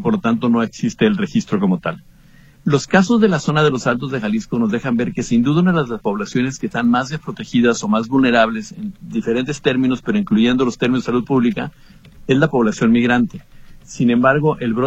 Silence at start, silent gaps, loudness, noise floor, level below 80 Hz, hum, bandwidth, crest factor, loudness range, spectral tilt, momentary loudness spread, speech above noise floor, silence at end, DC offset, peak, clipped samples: 0 s; none; -17 LUFS; -46 dBFS; -46 dBFS; none; 8.2 kHz; 16 dB; 1 LU; -6 dB/octave; 9 LU; 29 dB; 0 s; under 0.1%; 0 dBFS; under 0.1%